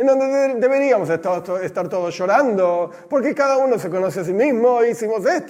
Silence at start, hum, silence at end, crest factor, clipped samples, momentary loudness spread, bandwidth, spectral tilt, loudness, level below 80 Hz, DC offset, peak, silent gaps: 0 s; none; 0 s; 16 dB; under 0.1%; 7 LU; 15 kHz; -6 dB/octave; -18 LUFS; -70 dBFS; under 0.1%; -2 dBFS; none